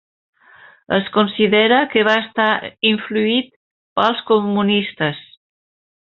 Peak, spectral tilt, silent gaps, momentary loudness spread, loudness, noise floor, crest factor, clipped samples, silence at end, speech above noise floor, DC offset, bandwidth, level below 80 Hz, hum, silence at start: 0 dBFS; -2.5 dB/octave; 3.56-3.96 s; 8 LU; -17 LUFS; -47 dBFS; 18 dB; under 0.1%; 0.85 s; 30 dB; under 0.1%; 6.8 kHz; -60 dBFS; none; 0.9 s